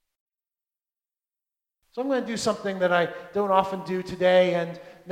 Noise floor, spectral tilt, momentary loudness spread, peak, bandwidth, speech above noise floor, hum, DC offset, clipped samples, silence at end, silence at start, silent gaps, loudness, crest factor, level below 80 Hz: under -90 dBFS; -5 dB/octave; 12 LU; -4 dBFS; 13 kHz; over 66 dB; none; under 0.1%; under 0.1%; 0 s; 1.95 s; none; -25 LUFS; 22 dB; -64 dBFS